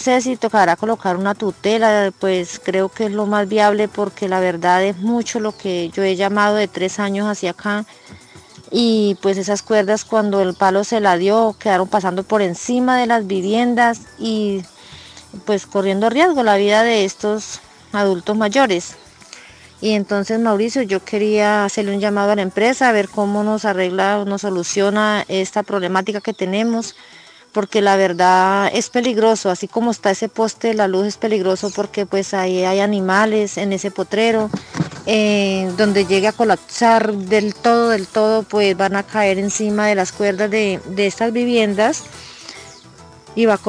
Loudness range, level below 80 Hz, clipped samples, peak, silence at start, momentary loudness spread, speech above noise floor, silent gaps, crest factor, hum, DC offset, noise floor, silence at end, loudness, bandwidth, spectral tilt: 3 LU; -58 dBFS; under 0.1%; 0 dBFS; 0 s; 8 LU; 26 dB; none; 16 dB; none; under 0.1%; -42 dBFS; 0 s; -17 LUFS; 10.5 kHz; -4.5 dB/octave